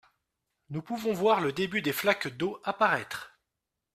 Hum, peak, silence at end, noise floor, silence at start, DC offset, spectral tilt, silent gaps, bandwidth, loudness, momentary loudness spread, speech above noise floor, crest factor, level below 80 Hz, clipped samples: none; -10 dBFS; 0.7 s; -86 dBFS; 0.7 s; under 0.1%; -4.5 dB/octave; none; 16 kHz; -28 LUFS; 14 LU; 57 dB; 20 dB; -70 dBFS; under 0.1%